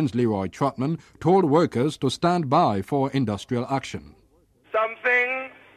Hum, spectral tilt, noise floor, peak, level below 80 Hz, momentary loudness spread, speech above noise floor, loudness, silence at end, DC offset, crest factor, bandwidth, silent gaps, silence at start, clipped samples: none; -6.5 dB/octave; -60 dBFS; -8 dBFS; -58 dBFS; 8 LU; 37 dB; -23 LUFS; 0.25 s; under 0.1%; 16 dB; 13.5 kHz; none; 0 s; under 0.1%